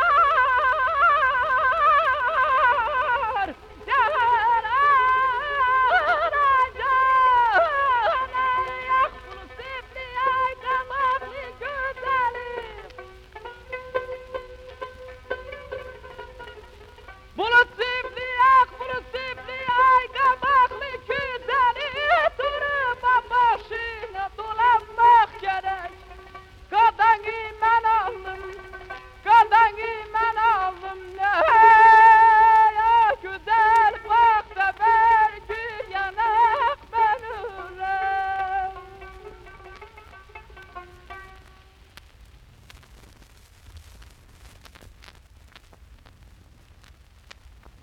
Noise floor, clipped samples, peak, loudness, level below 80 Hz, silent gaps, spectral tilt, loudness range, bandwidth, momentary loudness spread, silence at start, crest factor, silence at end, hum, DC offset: -51 dBFS; under 0.1%; -4 dBFS; -20 LUFS; -50 dBFS; none; -3.5 dB/octave; 14 LU; 8.6 kHz; 19 LU; 0 s; 18 dB; 3.8 s; none; under 0.1%